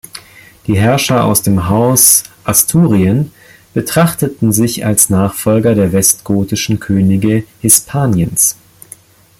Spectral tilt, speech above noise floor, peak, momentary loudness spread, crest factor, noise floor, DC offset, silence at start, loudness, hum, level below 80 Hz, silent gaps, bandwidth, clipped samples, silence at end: -4.5 dB/octave; 28 dB; 0 dBFS; 8 LU; 12 dB; -39 dBFS; under 0.1%; 0.15 s; -11 LUFS; none; -42 dBFS; none; over 20 kHz; 0.2%; 0.85 s